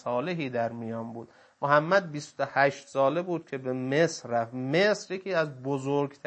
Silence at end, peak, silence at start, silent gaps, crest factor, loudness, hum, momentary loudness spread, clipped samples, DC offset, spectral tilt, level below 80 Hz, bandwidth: 0.1 s; -8 dBFS; 0.05 s; none; 20 dB; -28 LUFS; none; 10 LU; under 0.1%; under 0.1%; -5.5 dB/octave; -78 dBFS; 8.8 kHz